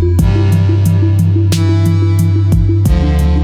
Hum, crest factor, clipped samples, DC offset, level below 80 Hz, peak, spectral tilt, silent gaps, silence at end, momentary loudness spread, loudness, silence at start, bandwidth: none; 8 dB; under 0.1%; under 0.1%; -18 dBFS; -2 dBFS; -7.5 dB/octave; none; 0 s; 1 LU; -11 LUFS; 0 s; 14 kHz